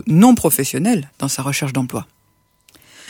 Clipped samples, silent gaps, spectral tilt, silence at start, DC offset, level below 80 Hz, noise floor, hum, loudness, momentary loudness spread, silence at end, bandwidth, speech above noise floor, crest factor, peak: under 0.1%; none; -5 dB/octave; 0.05 s; under 0.1%; -52 dBFS; -61 dBFS; none; -16 LUFS; 12 LU; 1.05 s; 19.5 kHz; 45 dB; 18 dB; 0 dBFS